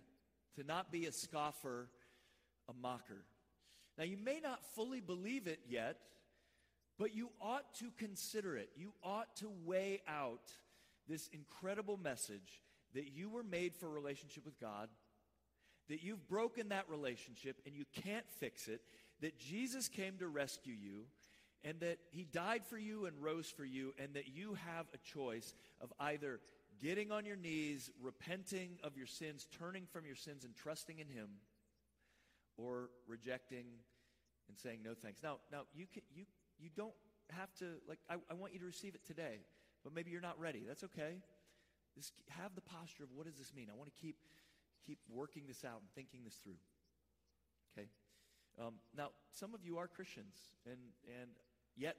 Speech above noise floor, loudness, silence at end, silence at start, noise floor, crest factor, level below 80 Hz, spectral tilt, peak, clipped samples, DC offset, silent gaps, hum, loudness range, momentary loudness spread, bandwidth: 35 dB; -49 LUFS; 0 s; 0 s; -84 dBFS; 22 dB; -84 dBFS; -4 dB/octave; -28 dBFS; under 0.1%; under 0.1%; none; none; 9 LU; 15 LU; 15.5 kHz